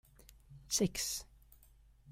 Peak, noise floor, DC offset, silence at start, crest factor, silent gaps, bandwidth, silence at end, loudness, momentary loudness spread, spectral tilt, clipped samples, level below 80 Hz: -18 dBFS; -64 dBFS; under 0.1%; 0.3 s; 22 dB; none; 16 kHz; 0 s; -36 LUFS; 25 LU; -3 dB/octave; under 0.1%; -60 dBFS